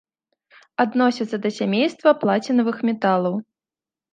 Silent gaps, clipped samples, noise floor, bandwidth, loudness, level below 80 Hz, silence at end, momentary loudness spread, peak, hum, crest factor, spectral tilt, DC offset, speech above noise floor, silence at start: none; under 0.1%; under -90 dBFS; 9 kHz; -21 LUFS; -74 dBFS; 0.7 s; 7 LU; -2 dBFS; none; 18 dB; -6.5 dB/octave; under 0.1%; over 70 dB; 0.8 s